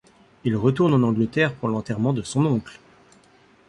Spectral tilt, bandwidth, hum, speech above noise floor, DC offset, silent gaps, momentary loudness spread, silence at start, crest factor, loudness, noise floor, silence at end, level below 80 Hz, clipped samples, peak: -7 dB/octave; 11.5 kHz; none; 34 dB; under 0.1%; none; 8 LU; 0.45 s; 16 dB; -22 LUFS; -55 dBFS; 0.95 s; -56 dBFS; under 0.1%; -6 dBFS